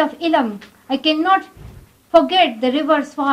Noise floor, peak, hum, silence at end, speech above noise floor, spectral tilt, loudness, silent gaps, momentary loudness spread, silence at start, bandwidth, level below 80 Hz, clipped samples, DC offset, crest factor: -40 dBFS; -2 dBFS; none; 0 s; 23 dB; -4.5 dB/octave; -17 LUFS; none; 8 LU; 0 s; 14.5 kHz; -52 dBFS; under 0.1%; under 0.1%; 16 dB